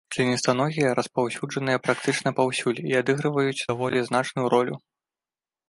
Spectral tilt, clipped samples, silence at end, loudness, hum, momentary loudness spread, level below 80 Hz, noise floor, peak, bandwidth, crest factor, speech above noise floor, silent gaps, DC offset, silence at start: -5 dB/octave; under 0.1%; 0.9 s; -24 LUFS; none; 4 LU; -66 dBFS; under -90 dBFS; -6 dBFS; 11.5 kHz; 20 dB; over 66 dB; none; under 0.1%; 0.1 s